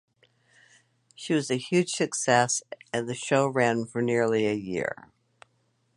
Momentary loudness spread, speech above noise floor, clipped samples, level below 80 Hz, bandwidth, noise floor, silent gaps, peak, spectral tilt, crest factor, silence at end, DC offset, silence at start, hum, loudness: 9 LU; 44 dB; under 0.1%; -68 dBFS; 11.5 kHz; -70 dBFS; none; -6 dBFS; -4 dB/octave; 22 dB; 1 s; under 0.1%; 1.2 s; none; -26 LUFS